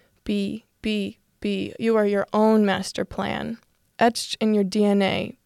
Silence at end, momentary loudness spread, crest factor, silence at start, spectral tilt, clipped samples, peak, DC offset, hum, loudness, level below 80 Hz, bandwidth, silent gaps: 0.15 s; 11 LU; 16 dB; 0.25 s; -5.5 dB/octave; under 0.1%; -6 dBFS; under 0.1%; none; -23 LUFS; -54 dBFS; 13.5 kHz; none